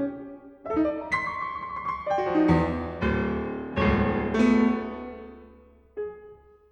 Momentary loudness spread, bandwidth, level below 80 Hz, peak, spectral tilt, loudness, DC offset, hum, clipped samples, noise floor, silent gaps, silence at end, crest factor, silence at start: 19 LU; 8.8 kHz; -42 dBFS; -10 dBFS; -8 dB/octave; -26 LUFS; under 0.1%; none; under 0.1%; -53 dBFS; none; 0.35 s; 18 dB; 0 s